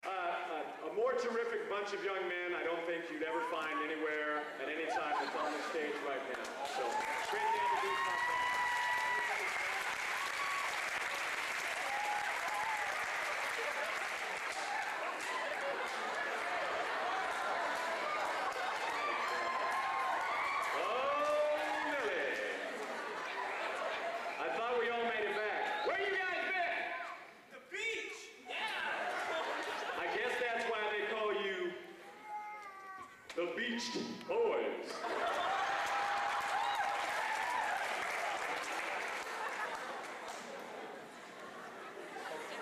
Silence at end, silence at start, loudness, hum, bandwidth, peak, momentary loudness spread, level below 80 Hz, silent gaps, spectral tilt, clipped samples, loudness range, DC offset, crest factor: 0 s; 0.05 s; -37 LUFS; none; 15 kHz; -26 dBFS; 10 LU; -78 dBFS; none; -1.5 dB/octave; under 0.1%; 4 LU; under 0.1%; 12 dB